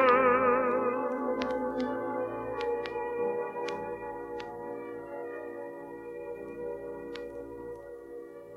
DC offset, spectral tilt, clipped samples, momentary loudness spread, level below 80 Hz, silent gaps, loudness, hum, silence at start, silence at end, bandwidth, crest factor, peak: under 0.1%; -6 dB/octave; under 0.1%; 16 LU; -62 dBFS; none; -33 LUFS; none; 0 s; 0 s; 7.2 kHz; 22 dB; -12 dBFS